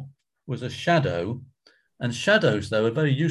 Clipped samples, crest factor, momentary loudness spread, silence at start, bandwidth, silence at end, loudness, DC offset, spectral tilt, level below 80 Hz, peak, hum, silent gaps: under 0.1%; 18 dB; 13 LU; 0 s; 12 kHz; 0 s; -24 LUFS; under 0.1%; -6 dB/octave; -54 dBFS; -6 dBFS; none; none